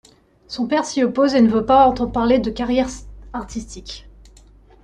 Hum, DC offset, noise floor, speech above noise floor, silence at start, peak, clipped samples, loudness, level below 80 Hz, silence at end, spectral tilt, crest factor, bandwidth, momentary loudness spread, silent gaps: none; under 0.1%; -47 dBFS; 30 dB; 0.5 s; -4 dBFS; under 0.1%; -18 LUFS; -40 dBFS; 0.85 s; -5 dB/octave; 16 dB; 10 kHz; 19 LU; none